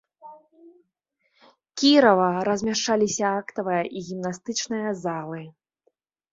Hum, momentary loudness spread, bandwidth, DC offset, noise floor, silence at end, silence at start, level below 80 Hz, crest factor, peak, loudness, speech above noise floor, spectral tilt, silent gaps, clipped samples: none; 15 LU; 7.8 kHz; under 0.1%; -74 dBFS; 0.85 s; 0.25 s; -66 dBFS; 22 dB; -4 dBFS; -23 LUFS; 51 dB; -4 dB/octave; none; under 0.1%